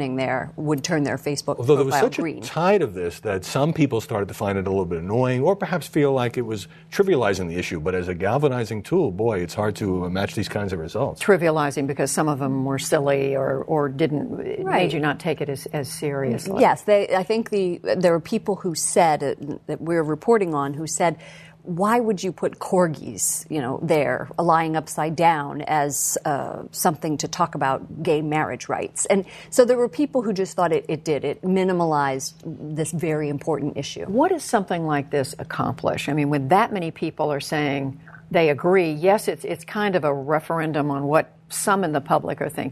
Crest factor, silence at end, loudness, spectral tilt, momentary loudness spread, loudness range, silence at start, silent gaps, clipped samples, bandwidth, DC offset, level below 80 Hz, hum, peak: 20 dB; 0 s; -22 LUFS; -5 dB/octave; 8 LU; 2 LU; 0 s; none; under 0.1%; 13.5 kHz; under 0.1%; -56 dBFS; none; -2 dBFS